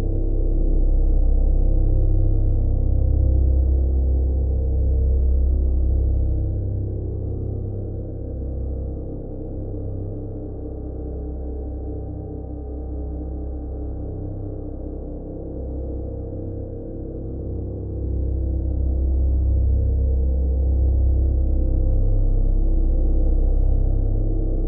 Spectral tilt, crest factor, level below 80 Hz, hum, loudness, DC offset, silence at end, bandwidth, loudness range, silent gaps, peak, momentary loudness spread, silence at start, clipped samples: -15 dB/octave; 12 dB; -20 dBFS; none; -24 LUFS; under 0.1%; 0 s; 1.2 kHz; 10 LU; none; -8 dBFS; 11 LU; 0 s; under 0.1%